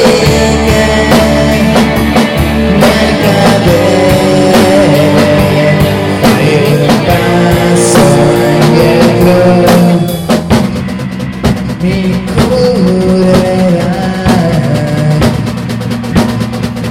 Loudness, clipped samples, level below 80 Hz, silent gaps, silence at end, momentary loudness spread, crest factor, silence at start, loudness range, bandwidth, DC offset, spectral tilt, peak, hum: -8 LUFS; 0.7%; -24 dBFS; none; 0 s; 7 LU; 8 dB; 0 s; 4 LU; 16.5 kHz; under 0.1%; -6 dB/octave; 0 dBFS; none